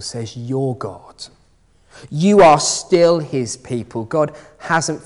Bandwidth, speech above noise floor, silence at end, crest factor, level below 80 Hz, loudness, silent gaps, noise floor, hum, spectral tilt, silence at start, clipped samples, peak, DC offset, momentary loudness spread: 11 kHz; 38 dB; 0.1 s; 16 dB; -50 dBFS; -16 LUFS; none; -55 dBFS; none; -4.5 dB/octave; 0 s; under 0.1%; -2 dBFS; under 0.1%; 24 LU